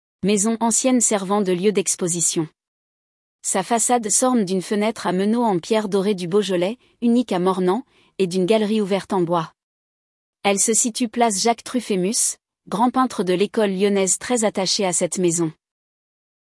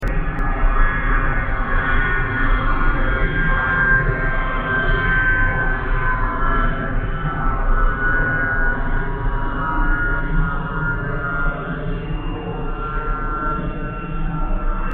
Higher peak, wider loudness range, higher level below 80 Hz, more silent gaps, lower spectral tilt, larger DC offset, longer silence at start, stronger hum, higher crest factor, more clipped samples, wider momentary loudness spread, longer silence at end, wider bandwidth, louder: about the same, -4 dBFS vs -4 dBFS; second, 1 LU vs 6 LU; second, -66 dBFS vs -20 dBFS; first, 2.68-3.39 s, 9.63-10.33 s vs none; second, -3.5 dB/octave vs -5 dB/octave; neither; first, 0.25 s vs 0 s; neither; about the same, 16 dB vs 14 dB; neither; about the same, 7 LU vs 9 LU; first, 1 s vs 0 s; first, 12 kHz vs 3.8 kHz; about the same, -20 LUFS vs -21 LUFS